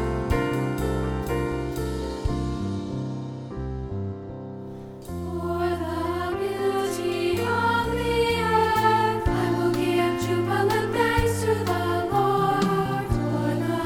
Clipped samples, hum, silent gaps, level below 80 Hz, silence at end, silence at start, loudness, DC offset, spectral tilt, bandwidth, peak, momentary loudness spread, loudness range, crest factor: under 0.1%; none; none; -38 dBFS; 0 s; 0 s; -25 LUFS; under 0.1%; -6 dB/octave; 19 kHz; -8 dBFS; 11 LU; 9 LU; 16 dB